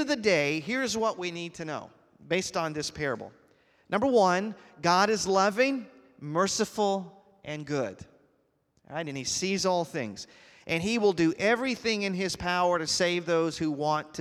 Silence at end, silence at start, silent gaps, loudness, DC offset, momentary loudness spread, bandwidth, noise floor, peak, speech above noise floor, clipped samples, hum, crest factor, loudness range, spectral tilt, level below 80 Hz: 0 s; 0 s; none; -28 LUFS; under 0.1%; 14 LU; 15 kHz; -71 dBFS; -8 dBFS; 43 dB; under 0.1%; none; 20 dB; 6 LU; -4 dB/octave; -62 dBFS